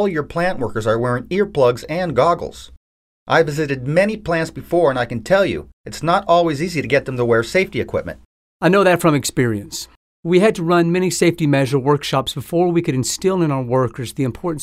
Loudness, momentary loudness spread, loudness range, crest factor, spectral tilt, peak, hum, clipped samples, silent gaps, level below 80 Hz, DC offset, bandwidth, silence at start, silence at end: -18 LUFS; 8 LU; 2 LU; 16 dB; -5.5 dB/octave; -2 dBFS; none; under 0.1%; 2.77-3.26 s, 5.73-5.84 s, 8.25-8.60 s, 9.96-10.23 s; -46 dBFS; under 0.1%; 16 kHz; 0 s; 0 s